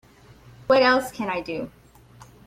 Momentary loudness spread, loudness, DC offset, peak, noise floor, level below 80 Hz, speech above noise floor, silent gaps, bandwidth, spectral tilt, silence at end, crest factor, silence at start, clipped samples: 20 LU; -22 LUFS; under 0.1%; -6 dBFS; -50 dBFS; -56 dBFS; 29 dB; none; 15.5 kHz; -4.5 dB/octave; 0.8 s; 18 dB; 0.7 s; under 0.1%